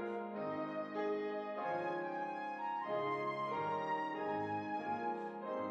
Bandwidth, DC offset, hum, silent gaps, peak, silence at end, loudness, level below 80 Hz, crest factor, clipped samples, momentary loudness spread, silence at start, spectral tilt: 8.8 kHz; under 0.1%; none; none; -28 dBFS; 0 s; -40 LUFS; -86 dBFS; 12 dB; under 0.1%; 4 LU; 0 s; -7 dB/octave